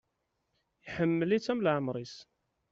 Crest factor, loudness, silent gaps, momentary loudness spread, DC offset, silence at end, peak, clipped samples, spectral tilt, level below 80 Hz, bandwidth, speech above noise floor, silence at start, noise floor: 18 dB; -31 LUFS; none; 16 LU; under 0.1%; 0.5 s; -16 dBFS; under 0.1%; -5.5 dB/octave; -68 dBFS; 7.8 kHz; 50 dB; 0.85 s; -81 dBFS